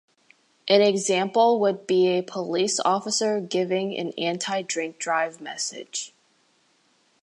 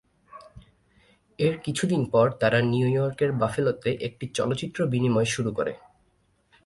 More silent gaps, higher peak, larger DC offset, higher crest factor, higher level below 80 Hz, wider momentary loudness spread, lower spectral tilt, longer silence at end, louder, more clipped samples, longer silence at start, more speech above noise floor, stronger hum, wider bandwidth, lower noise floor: neither; about the same, -6 dBFS vs -8 dBFS; neither; about the same, 20 dB vs 18 dB; second, -80 dBFS vs -58 dBFS; first, 11 LU vs 8 LU; second, -3.5 dB/octave vs -6 dB/octave; first, 1.15 s vs 0.9 s; about the same, -24 LUFS vs -25 LUFS; neither; first, 0.65 s vs 0.35 s; about the same, 41 dB vs 42 dB; neither; about the same, 11.5 kHz vs 11.5 kHz; about the same, -65 dBFS vs -67 dBFS